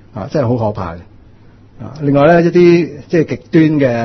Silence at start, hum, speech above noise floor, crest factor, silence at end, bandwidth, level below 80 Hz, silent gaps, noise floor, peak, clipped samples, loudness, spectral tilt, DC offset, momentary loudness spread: 0.15 s; none; 29 dB; 12 dB; 0 s; 6.4 kHz; -44 dBFS; none; -41 dBFS; 0 dBFS; under 0.1%; -12 LUFS; -8.5 dB/octave; under 0.1%; 16 LU